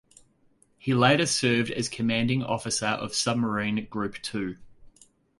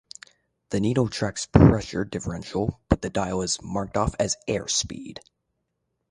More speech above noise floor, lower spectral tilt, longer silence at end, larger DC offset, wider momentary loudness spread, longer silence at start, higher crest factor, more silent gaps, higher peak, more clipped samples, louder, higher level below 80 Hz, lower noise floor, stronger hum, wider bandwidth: second, 38 dB vs 54 dB; about the same, -4 dB/octave vs -5 dB/octave; second, 0.5 s vs 0.9 s; neither; second, 12 LU vs 16 LU; first, 0.85 s vs 0.7 s; about the same, 22 dB vs 24 dB; neither; second, -6 dBFS vs 0 dBFS; neither; about the same, -26 LUFS vs -24 LUFS; second, -58 dBFS vs -38 dBFS; second, -64 dBFS vs -77 dBFS; neither; about the same, 11.5 kHz vs 11.5 kHz